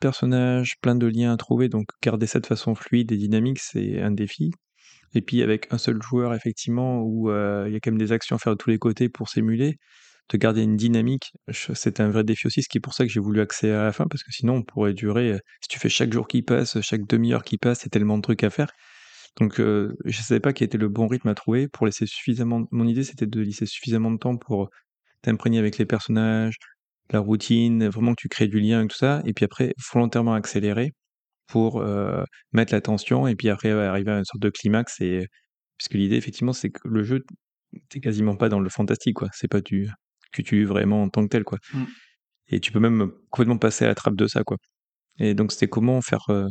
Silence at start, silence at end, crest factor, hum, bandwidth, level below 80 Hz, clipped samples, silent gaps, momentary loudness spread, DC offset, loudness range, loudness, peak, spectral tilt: 0 s; 0 s; 20 dB; none; 9 kHz; -64 dBFS; under 0.1%; 24.90-24.96 s, 26.82-26.99 s, 31.10-31.28 s, 35.50-35.70 s, 37.43-37.62 s, 40.06-40.10 s, 44.76-45.05 s; 7 LU; under 0.1%; 3 LU; -23 LUFS; -2 dBFS; -6.5 dB/octave